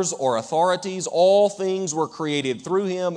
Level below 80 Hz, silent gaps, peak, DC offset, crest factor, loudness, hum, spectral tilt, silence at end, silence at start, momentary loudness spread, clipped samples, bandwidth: -74 dBFS; none; -8 dBFS; under 0.1%; 14 dB; -22 LUFS; none; -4 dB/octave; 0 s; 0 s; 8 LU; under 0.1%; 10 kHz